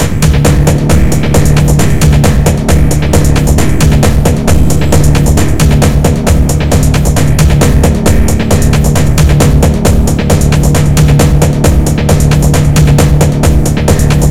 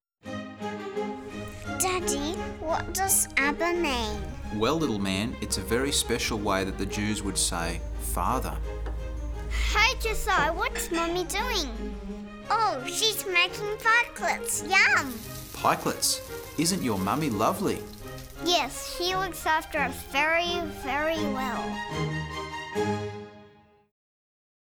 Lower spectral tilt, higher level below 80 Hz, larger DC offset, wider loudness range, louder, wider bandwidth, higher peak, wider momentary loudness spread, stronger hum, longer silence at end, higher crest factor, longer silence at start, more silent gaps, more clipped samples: first, -6 dB/octave vs -3 dB/octave; first, -12 dBFS vs -40 dBFS; first, 10% vs under 0.1%; second, 1 LU vs 5 LU; first, -8 LUFS vs -27 LUFS; second, 16.5 kHz vs over 20 kHz; first, 0 dBFS vs -8 dBFS; second, 2 LU vs 13 LU; neither; second, 0 s vs 1.25 s; second, 8 dB vs 20 dB; second, 0 s vs 0.25 s; neither; first, 3% vs under 0.1%